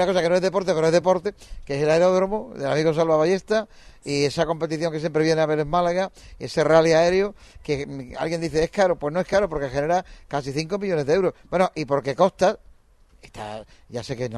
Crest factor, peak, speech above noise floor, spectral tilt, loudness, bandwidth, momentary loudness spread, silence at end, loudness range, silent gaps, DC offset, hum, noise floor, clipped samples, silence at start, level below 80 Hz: 20 dB; -2 dBFS; 32 dB; -5.5 dB/octave; -22 LUFS; 12 kHz; 14 LU; 0 s; 3 LU; none; under 0.1%; none; -55 dBFS; under 0.1%; 0 s; -48 dBFS